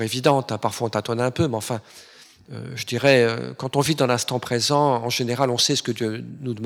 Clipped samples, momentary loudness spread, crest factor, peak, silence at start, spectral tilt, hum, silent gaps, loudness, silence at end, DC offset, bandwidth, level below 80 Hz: under 0.1%; 13 LU; 20 dB; -2 dBFS; 0 s; -4.5 dB/octave; none; none; -22 LUFS; 0 s; under 0.1%; 18 kHz; -60 dBFS